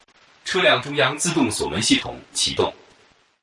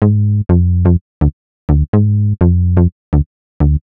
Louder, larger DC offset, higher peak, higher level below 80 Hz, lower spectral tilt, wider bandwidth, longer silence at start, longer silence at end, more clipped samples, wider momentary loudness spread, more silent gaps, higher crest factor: second, -20 LUFS vs -14 LUFS; neither; second, -6 dBFS vs 0 dBFS; second, -52 dBFS vs -20 dBFS; second, -3 dB/octave vs -13.5 dB/octave; first, 11.5 kHz vs 2.7 kHz; first, 0.45 s vs 0 s; first, 0.7 s vs 0.05 s; neither; about the same, 8 LU vs 6 LU; second, none vs 1.01-1.21 s, 1.33-1.68 s, 1.88-1.93 s, 2.92-3.12 s, 3.26-3.60 s; about the same, 16 dB vs 12 dB